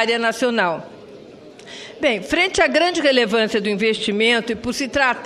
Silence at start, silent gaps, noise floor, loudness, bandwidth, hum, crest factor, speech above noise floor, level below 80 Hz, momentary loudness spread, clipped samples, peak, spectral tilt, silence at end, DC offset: 0 s; none; -41 dBFS; -18 LUFS; 13.5 kHz; none; 18 dB; 22 dB; -50 dBFS; 13 LU; under 0.1%; -2 dBFS; -3.5 dB/octave; 0 s; under 0.1%